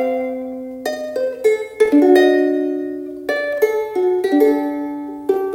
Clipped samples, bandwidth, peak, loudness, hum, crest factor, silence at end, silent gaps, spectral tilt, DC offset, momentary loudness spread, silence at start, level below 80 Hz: under 0.1%; 17 kHz; 0 dBFS; -18 LUFS; none; 16 dB; 0 s; none; -4.5 dB/octave; under 0.1%; 14 LU; 0 s; -60 dBFS